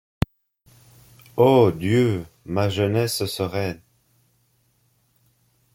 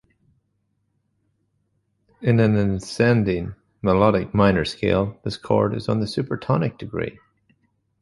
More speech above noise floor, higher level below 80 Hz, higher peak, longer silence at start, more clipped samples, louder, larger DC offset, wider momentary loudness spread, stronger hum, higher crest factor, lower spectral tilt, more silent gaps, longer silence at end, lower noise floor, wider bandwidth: second, 45 dB vs 51 dB; about the same, -48 dBFS vs -44 dBFS; about the same, -2 dBFS vs -2 dBFS; second, 1.35 s vs 2.2 s; neither; about the same, -22 LUFS vs -21 LUFS; neither; first, 14 LU vs 11 LU; neither; about the same, 22 dB vs 20 dB; second, -6 dB/octave vs -7.5 dB/octave; neither; first, 2 s vs 0.9 s; second, -65 dBFS vs -71 dBFS; first, 16.5 kHz vs 11.5 kHz